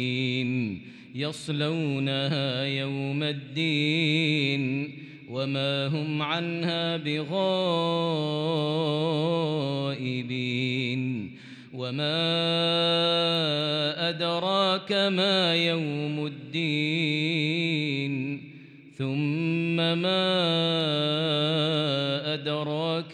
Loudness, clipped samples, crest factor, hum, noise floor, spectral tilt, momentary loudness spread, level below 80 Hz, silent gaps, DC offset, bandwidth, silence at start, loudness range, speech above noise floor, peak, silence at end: -26 LUFS; under 0.1%; 14 dB; none; -48 dBFS; -6 dB/octave; 9 LU; -80 dBFS; none; under 0.1%; 10 kHz; 0 s; 4 LU; 21 dB; -12 dBFS; 0 s